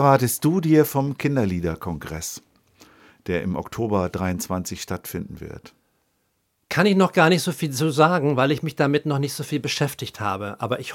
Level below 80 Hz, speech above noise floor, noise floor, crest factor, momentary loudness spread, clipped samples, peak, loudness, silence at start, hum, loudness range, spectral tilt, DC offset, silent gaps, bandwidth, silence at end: -50 dBFS; 49 dB; -71 dBFS; 20 dB; 13 LU; under 0.1%; -2 dBFS; -22 LUFS; 0 s; none; 8 LU; -5.5 dB/octave; under 0.1%; none; 17 kHz; 0 s